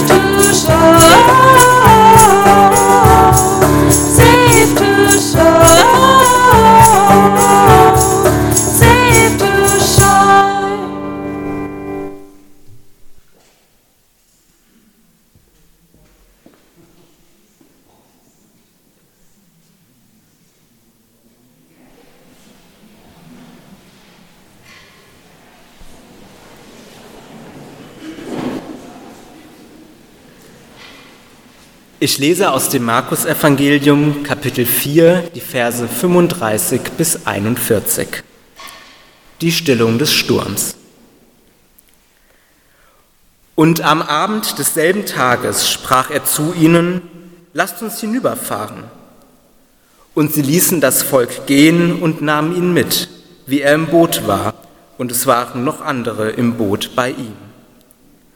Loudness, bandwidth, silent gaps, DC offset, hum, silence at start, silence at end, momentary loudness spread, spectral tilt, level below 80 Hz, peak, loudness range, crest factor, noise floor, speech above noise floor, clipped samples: -10 LUFS; over 20 kHz; none; under 0.1%; none; 0 s; 1 s; 17 LU; -4 dB/octave; -32 dBFS; 0 dBFS; 20 LU; 14 dB; -55 dBFS; 41 dB; 0.4%